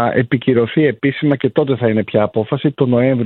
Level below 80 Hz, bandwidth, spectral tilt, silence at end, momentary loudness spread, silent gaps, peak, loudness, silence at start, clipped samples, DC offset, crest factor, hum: -54 dBFS; 4.3 kHz; -11.5 dB/octave; 0 s; 3 LU; none; 0 dBFS; -16 LUFS; 0 s; under 0.1%; under 0.1%; 14 dB; none